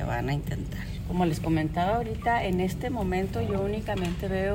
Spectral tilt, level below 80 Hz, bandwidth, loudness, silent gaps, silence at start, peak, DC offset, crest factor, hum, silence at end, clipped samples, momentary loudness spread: -7 dB/octave; -38 dBFS; 16.5 kHz; -29 LUFS; none; 0 s; -14 dBFS; under 0.1%; 14 dB; none; 0 s; under 0.1%; 6 LU